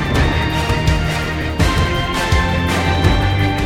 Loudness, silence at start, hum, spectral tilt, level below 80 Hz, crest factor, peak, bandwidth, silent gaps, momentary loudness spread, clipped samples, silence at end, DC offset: -16 LUFS; 0 s; none; -5.5 dB/octave; -22 dBFS; 14 dB; 0 dBFS; 16 kHz; none; 3 LU; under 0.1%; 0 s; under 0.1%